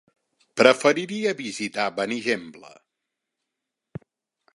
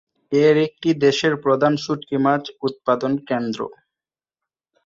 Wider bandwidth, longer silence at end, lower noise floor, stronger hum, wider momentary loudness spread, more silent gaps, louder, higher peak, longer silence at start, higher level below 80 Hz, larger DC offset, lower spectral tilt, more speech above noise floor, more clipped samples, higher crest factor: first, 11.5 kHz vs 7.6 kHz; first, 1.9 s vs 1.15 s; second, -84 dBFS vs under -90 dBFS; neither; first, 26 LU vs 9 LU; neither; about the same, -22 LUFS vs -20 LUFS; first, 0 dBFS vs -4 dBFS; first, 0.55 s vs 0.3 s; second, -70 dBFS vs -64 dBFS; neither; second, -3.5 dB/octave vs -6 dB/octave; second, 61 dB vs over 71 dB; neither; first, 26 dB vs 16 dB